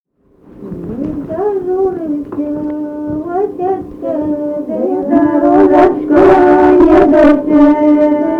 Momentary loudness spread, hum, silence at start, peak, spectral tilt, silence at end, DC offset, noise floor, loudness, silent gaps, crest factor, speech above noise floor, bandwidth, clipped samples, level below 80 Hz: 14 LU; none; 0.55 s; 0 dBFS; -8.5 dB/octave; 0 s; under 0.1%; -46 dBFS; -11 LUFS; none; 10 dB; 36 dB; 5.4 kHz; under 0.1%; -36 dBFS